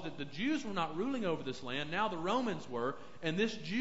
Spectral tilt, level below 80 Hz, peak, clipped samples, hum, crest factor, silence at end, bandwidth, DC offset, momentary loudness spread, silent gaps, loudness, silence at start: -3.5 dB/octave; -66 dBFS; -20 dBFS; under 0.1%; none; 18 dB; 0 s; 7.6 kHz; 0.5%; 5 LU; none; -37 LUFS; 0 s